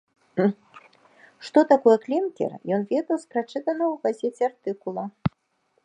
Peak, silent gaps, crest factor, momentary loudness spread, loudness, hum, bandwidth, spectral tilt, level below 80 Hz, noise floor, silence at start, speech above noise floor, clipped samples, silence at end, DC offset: -4 dBFS; none; 20 dB; 13 LU; -24 LUFS; none; 10 kHz; -7.5 dB/octave; -60 dBFS; -70 dBFS; 0.35 s; 47 dB; under 0.1%; 0.55 s; under 0.1%